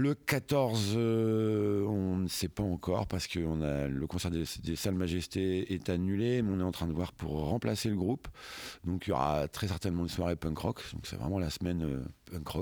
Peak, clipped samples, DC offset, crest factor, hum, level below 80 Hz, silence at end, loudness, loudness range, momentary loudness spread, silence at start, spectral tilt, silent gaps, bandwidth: -14 dBFS; under 0.1%; under 0.1%; 18 dB; none; -50 dBFS; 0 s; -33 LUFS; 3 LU; 8 LU; 0 s; -6 dB/octave; none; over 20 kHz